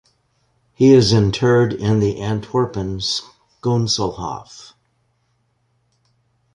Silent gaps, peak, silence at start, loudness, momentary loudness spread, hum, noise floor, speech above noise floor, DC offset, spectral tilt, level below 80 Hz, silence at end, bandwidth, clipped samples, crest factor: none; -2 dBFS; 0.8 s; -17 LUFS; 14 LU; none; -65 dBFS; 49 dB; under 0.1%; -6 dB/octave; -44 dBFS; 1.9 s; 11 kHz; under 0.1%; 18 dB